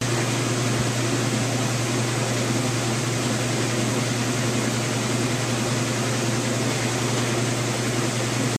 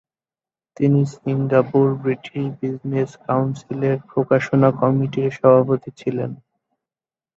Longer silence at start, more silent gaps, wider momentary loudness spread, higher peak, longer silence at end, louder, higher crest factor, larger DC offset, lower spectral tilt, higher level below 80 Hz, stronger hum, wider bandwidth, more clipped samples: second, 0 s vs 0.8 s; neither; second, 1 LU vs 10 LU; second, -10 dBFS vs -2 dBFS; second, 0 s vs 1 s; second, -23 LUFS vs -20 LUFS; about the same, 14 dB vs 18 dB; neither; second, -4 dB/octave vs -9 dB/octave; first, -52 dBFS vs -60 dBFS; neither; first, 14.5 kHz vs 7.6 kHz; neither